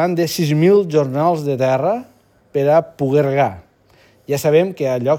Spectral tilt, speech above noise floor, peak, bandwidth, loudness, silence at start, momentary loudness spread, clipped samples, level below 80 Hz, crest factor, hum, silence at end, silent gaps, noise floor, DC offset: -6.5 dB/octave; 37 dB; -2 dBFS; 18.5 kHz; -17 LUFS; 0 s; 8 LU; under 0.1%; -60 dBFS; 14 dB; none; 0 s; none; -52 dBFS; under 0.1%